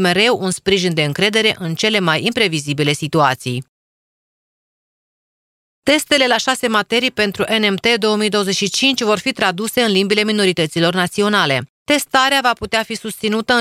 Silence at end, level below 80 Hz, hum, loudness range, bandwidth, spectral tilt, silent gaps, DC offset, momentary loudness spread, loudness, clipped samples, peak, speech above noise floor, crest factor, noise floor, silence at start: 0 s; -52 dBFS; none; 5 LU; 16 kHz; -3.5 dB/octave; 3.68-5.82 s, 11.69-11.86 s; under 0.1%; 5 LU; -16 LUFS; under 0.1%; 0 dBFS; over 74 dB; 16 dB; under -90 dBFS; 0 s